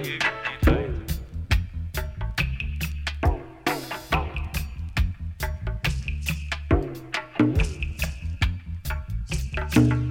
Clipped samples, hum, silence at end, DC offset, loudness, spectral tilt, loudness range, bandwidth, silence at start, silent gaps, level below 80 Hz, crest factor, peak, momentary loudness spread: under 0.1%; none; 0 s; under 0.1%; -27 LUFS; -5.5 dB/octave; 2 LU; 17 kHz; 0 s; none; -30 dBFS; 22 dB; -4 dBFS; 9 LU